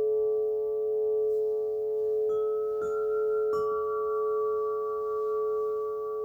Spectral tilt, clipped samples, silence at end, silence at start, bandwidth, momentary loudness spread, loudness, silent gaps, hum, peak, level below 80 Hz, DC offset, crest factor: -7 dB/octave; under 0.1%; 0 s; 0 s; 5.8 kHz; 3 LU; -29 LUFS; none; none; -20 dBFS; -68 dBFS; under 0.1%; 8 dB